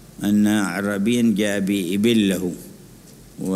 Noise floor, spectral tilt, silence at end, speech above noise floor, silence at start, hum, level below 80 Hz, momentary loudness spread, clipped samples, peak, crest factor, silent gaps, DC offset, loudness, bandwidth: -45 dBFS; -5.5 dB/octave; 0 s; 25 dB; 0 s; none; -54 dBFS; 9 LU; under 0.1%; -6 dBFS; 14 dB; none; under 0.1%; -20 LUFS; 15.5 kHz